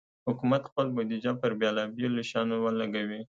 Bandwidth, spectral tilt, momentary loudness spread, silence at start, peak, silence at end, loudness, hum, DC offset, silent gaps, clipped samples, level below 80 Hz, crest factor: 7.6 kHz; -6.5 dB/octave; 3 LU; 0.25 s; -14 dBFS; 0.1 s; -30 LUFS; none; under 0.1%; 0.72-0.76 s; under 0.1%; -72 dBFS; 16 dB